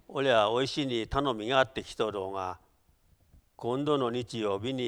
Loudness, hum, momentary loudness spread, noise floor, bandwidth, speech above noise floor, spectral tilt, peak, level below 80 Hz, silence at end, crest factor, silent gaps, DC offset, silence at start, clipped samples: -30 LUFS; none; 11 LU; -66 dBFS; 12.5 kHz; 37 dB; -5 dB/octave; -10 dBFS; -54 dBFS; 0 s; 20 dB; none; under 0.1%; 0.1 s; under 0.1%